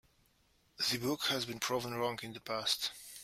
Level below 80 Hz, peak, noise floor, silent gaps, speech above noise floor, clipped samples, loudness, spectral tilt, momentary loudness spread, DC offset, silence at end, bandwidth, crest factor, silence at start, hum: -72 dBFS; -18 dBFS; -72 dBFS; none; 35 dB; under 0.1%; -35 LUFS; -2.5 dB/octave; 6 LU; under 0.1%; 0 s; 16 kHz; 20 dB; 0.8 s; none